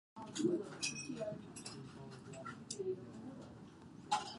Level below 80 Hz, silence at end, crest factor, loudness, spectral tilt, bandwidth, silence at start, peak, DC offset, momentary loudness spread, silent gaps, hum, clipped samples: -74 dBFS; 0 s; 22 dB; -44 LUFS; -4 dB/octave; 11.5 kHz; 0.15 s; -22 dBFS; under 0.1%; 16 LU; none; none; under 0.1%